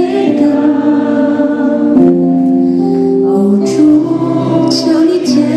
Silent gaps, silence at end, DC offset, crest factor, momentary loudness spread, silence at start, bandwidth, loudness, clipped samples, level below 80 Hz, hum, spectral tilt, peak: none; 0 s; under 0.1%; 10 dB; 3 LU; 0 s; 10.5 kHz; -10 LUFS; 0.1%; -52 dBFS; none; -6.5 dB/octave; 0 dBFS